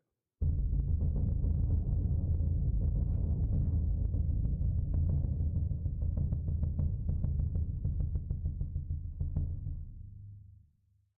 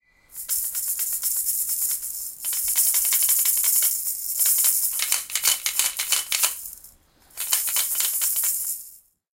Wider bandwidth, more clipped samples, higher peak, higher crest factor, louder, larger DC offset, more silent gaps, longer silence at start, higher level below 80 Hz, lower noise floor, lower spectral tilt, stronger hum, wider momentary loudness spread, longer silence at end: second, 1.2 kHz vs 17.5 kHz; neither; second, -18 dBFS vs -2 dBFS; second, 14 dB vs 22 dB; second, -34 LUFS vs -20 LUFS; neither; neither; about the same, 0.4 s vs 0.3 s; first, -36 dBFS vs -62 dBFS; first, -71 dBFS vs -54 dBFS; first, -16 dB/octave vs 4 dB/octave; neither; second, 7 LU vs 10 LU; first, 0.7 s vs 0.35 s